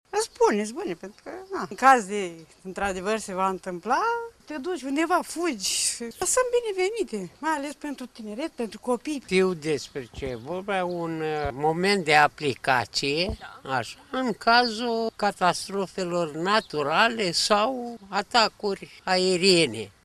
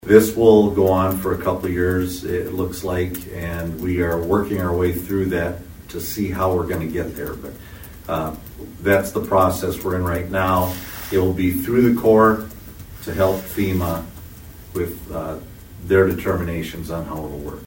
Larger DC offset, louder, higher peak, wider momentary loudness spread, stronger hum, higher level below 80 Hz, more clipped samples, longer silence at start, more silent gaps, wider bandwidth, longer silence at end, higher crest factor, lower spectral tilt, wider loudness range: neither; second, -25 LUFS vs -20 LUFS; second, -4 dBFS vs 0 dBFS; second, 14 LU vs 19 LU; neither; second, -54 dBFS vs -40 dBFS; neither; about the same, 0.15 s vs 0.05 s; neither; second, 14 kHz vs 16.5 kHz; first, 0.15 s vs 0 s; about the same, 22 dB vs 20 dB; second, -3 dB/octave vs -6.5 dB/octave; about the same, 5 LU vs 6 LU